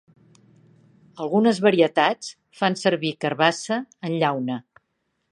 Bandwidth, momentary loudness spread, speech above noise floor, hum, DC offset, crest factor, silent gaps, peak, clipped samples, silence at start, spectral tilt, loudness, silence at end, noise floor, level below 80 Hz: 11.5 kHz; 13 LU; 53 dB; none; under 0.1%; 22 dB; none; -2 dBFS; under 0.1%; 1.15 s; -5 dB/octave; -22 LUFS; 0.7 s; -74 dBFS; -74 dBFS